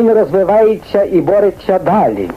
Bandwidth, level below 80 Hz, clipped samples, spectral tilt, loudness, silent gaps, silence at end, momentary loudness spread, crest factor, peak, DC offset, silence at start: 14.5 kHz; -42 dBFS; under 0.1%; -8.5 dB/octave; -12 LUFS; none; 0 s; 3 LU; 10 dB; -2 dBFS; 0.2%; 0 s